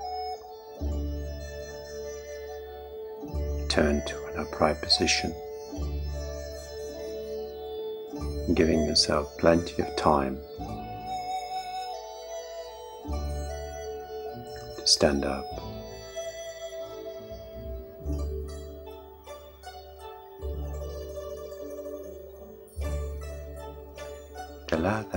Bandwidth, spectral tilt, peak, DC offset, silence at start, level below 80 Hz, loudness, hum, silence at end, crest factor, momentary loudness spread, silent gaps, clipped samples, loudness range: 16.5 kHz; -4 dB/octave; -4 dBFS; under 0.1%; 0 s; -42 dBFS; -31 LUFS; none; 0 s; 26 dB; 18 LU; none; under 0.1%; 13 LU